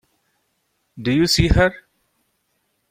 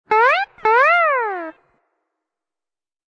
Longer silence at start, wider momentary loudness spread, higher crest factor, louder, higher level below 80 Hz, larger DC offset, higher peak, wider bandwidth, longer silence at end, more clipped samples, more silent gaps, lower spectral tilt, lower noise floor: first, 0.95 s vs 0.1 s; second, 7 LU vs 15 LU; about the same, 20 dB vs 16 dB; about the same, -18 LUFS vs -16 LUFS; first, -32 dBFS vs -68 dBFS; neither; about the same, -2 dBFS vs -4 dBFS; first, 16.5 kHz vs 8.8 kHz; second, 1.15 s vs 1.6 s; neither; neither; first, -5 dB/octave vs -2.5 dB/octave; second, -70 dBFS vs under -90 dBFS